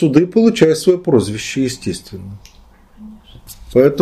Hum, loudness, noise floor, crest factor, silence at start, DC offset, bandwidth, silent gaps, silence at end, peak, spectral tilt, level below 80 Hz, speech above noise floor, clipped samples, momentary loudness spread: none; -15 LUFS; -45 dBFS; 16 dB; 0 s; under 0.1%; 14 kHz; none; 0 s; 0 dBFS; -6 dB/octave; -44 dBFS; 31 dB; under 0.1%; 18 LU